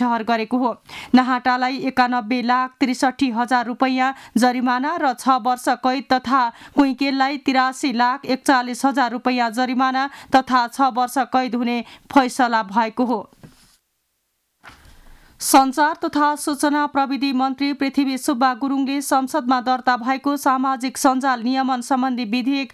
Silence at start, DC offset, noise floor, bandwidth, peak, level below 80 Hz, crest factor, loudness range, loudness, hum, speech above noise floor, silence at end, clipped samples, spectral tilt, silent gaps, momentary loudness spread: 0 s; under 0.1%; -71 dBFS; 14.5 kHz; -4 dBFS; -60 dBFS; 14 dB; 3 LU; -19 LUFS; none; 52 dB; 0.05 s; under 0.1%; -3 dB/octave; none; 4 LU